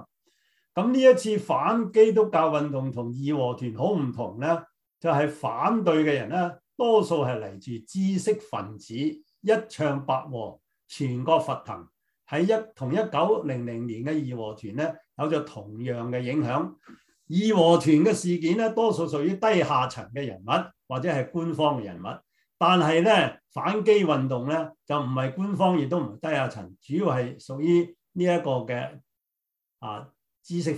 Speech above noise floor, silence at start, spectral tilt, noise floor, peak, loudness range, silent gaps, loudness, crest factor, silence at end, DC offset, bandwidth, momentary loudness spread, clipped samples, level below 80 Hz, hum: 60 dB; 0 s; -6.5 dB/octave; -85 dBFS; -4 dBFS; 6 LU; none; -25 LUFS; 20 dB; 0 s; under 0.1%; 12 kHz; 14 LU; under 0.1%; -68 dBFS; none